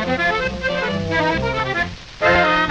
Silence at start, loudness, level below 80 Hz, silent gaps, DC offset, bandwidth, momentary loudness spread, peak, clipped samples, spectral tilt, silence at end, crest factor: 0 s; -19 LUFS; -38 dBFS; none; under 0.1%; 9 kHz; 7 LU; -6 dBFS; under 0.1%; -5.5 dB/octave; 0 s; 14 dB